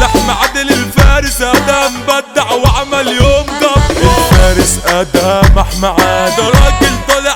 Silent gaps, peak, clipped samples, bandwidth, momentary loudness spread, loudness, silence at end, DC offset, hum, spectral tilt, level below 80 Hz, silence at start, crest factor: none; 0 dBFS; 0.6%; 18 kHz; 4 LU; -10 LUFS; 0 s; under 0.1%; none; -4.5 dB/octave; -14 dBFS; 0 s; 8 dB